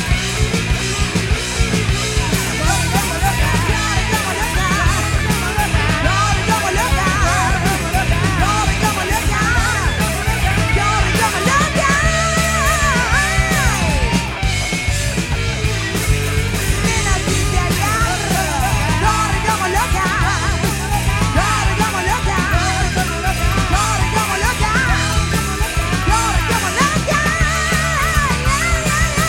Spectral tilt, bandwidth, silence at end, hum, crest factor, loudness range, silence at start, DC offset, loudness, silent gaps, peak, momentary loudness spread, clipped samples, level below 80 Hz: -4 dB/octave; 16.5 kHz; 0 s; none; 16 dB; 2 LU; 0 s; under 0.1%; -16 LUFS; none; 0 dBFS; 3 LU; under 0.1%; -22 dBFS